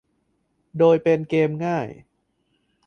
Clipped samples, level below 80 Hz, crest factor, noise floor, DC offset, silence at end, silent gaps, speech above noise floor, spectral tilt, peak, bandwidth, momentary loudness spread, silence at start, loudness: under 0.1%; -64 dBFS; 18 dB; -70 dBFS; under 0.1%; 0.95 s; none; 50 dB; -8 dB/octave; -4 dBFS; 6.6 kHz; 15 LU; 0.75 s; -20 LUFS